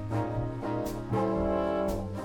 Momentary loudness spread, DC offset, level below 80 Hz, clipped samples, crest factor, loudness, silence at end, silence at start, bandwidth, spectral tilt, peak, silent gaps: 5 LU; under 0.1%; -44 dBFS; under 0.1%; 14 dB; -31 LUFS; 0 s; 0 s; 19.5 kHz; -8 dB/octave; -16 dBFS; none